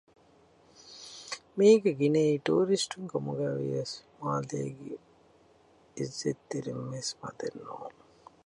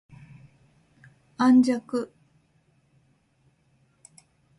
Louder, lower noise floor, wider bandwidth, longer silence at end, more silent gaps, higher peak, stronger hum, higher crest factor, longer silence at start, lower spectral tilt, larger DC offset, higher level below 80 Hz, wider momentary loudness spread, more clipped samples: second, -30 LUFS vs -22 LUFS; second, -62 dBFS vs -66 dBFS; about the same, 11.5 kHz vs 11.5 kHz; second, 0.55 s vs 2.55 s; neither; about the same, -10 dBFS vs -10 dBFS; neither; about the same, 22 dB vs 18 dB; second, 0.85 s vs 1.4 s; about the same, -5.5 dB/octave vs -5.5 dB/octave; neither; about the same, -74 dBFS vs -70 dBFS; first, 20 LU vs 14 LU; neither